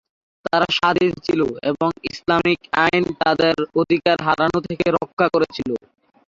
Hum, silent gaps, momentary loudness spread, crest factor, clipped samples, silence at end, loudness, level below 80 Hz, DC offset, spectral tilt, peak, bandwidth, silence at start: none; 5.13-5.17 s; 6 LU; 18 dB; under 0.1%; 0.5 s; -19 LUFS; -52 dBFS; under 0.1%; -6 dB/octave; -2 dBFS; 7.6 kHz; 0.45 s